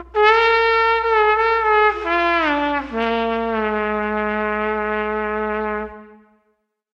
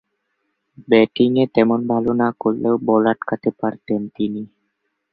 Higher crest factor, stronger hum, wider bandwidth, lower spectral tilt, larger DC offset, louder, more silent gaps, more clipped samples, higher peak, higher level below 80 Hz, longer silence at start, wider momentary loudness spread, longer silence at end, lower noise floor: about the same, 18 dB vs 18 dB; neither; first, 6.8 kHz vs 4.9 kHz; second, -5.5 dB/octave vs -10.5 dB/octave; neither; about the same, -18 LUFS vs -18 LUFS; neither; neither; about the same, 0 dBFS vs -2 dBFS; first, -44 dBFS vs -58 dBFS; second, 0 s vs 0.8 s; about the same, 8 LU vs 9 LU; first, 0.85 s vs 0.65 s; second, -68 dBFS vs -73 dBFS